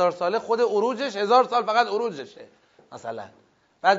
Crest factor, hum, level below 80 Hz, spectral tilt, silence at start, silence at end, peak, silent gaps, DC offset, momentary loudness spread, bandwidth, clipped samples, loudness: 18 dB; none; -78 dBFS; -4 dB/octave; 0 s; 0 s; -6 dBFS; none; under 0.1%; 19 LU; 7.8 kHz; under 0.1%; -23 LUFS